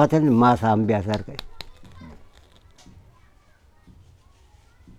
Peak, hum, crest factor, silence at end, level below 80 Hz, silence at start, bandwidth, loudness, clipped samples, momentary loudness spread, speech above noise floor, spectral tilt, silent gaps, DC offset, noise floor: -4 dBFS; none; 20 dB; 2.85 s; -50 dBFS; 0 s; 13 kHz; -20 LUFS; under 0.1%; 25 LU; 36 dB; -8 dB/octave; none; under 0.1%; -55 dBFS